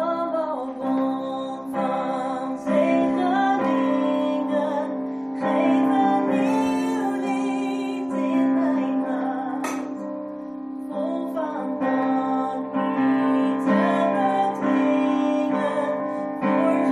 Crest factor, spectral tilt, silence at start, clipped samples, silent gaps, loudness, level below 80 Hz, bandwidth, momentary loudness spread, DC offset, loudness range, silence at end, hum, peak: 14 dB; -6.5 dB/octave; 0 s; under 0.1%; none; -23 LUFS; -68 dBFS; 11 kHz; 8 LU; under 0.1%; 5 LU; 0 s; none; -8 dBFS